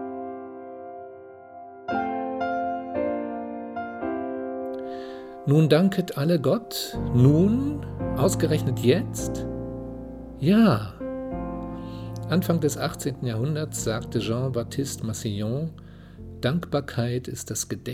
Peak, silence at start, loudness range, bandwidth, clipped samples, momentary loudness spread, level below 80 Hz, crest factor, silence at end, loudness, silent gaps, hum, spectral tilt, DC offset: -6 dBFS; 0 s; 8 LU; 16 kHz; under 0.1%; 18 LU; -46 dBFS; 20 dB; 0 s; -26 LUFS; none; none; -6 dB/octave; under 0.1%